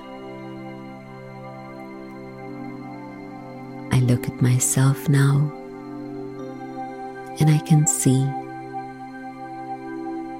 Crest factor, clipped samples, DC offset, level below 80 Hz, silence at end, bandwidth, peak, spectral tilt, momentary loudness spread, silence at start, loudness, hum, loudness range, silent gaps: 18 dB; under 0.1%; under 0.1%; -54 dBFS; 0 s; 16 kHz; -6 dBFS; -5.5 dB/octave; 19 LU; 0 s; -22 LUFS; none; 15 LU; none